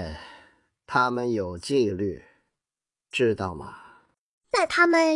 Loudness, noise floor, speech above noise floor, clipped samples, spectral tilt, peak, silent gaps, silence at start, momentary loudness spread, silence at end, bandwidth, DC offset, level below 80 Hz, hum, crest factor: -25 LUFS; under -90 dBFS; over 66 dB; under 0.1%; -5 dB/octave; -6 dBFS; 4.18-4.41 s; 0 s; 22 LU; 0 s; 11.5 kHz; under 0.1%; -58 dBFS; none; 20 dB